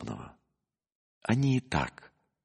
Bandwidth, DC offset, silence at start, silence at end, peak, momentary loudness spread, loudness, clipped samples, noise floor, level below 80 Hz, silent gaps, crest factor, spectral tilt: 10.5 kHz; under 0.1%; 0 s; 0.55 s; -12 dBFS; 16 LU; -31 LUFS; under 0.1%; -84 dBFS; -54 dBFS; 0.95-1.21 s; 22 dB; -6.5 dB/octave